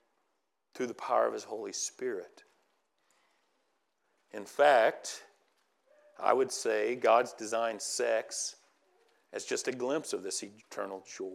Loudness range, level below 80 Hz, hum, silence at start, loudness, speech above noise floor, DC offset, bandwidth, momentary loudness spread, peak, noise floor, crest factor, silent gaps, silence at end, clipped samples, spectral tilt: 7 LU; under -90 dBFS; none; 0.75 s; -32 LUFS; 50 dB; under 0.1%; 15 kHz; 15 LU; -12 dBFS; -81 dBFS; 22 dB; none; 0 s; under 0.1%; -2 dB/octave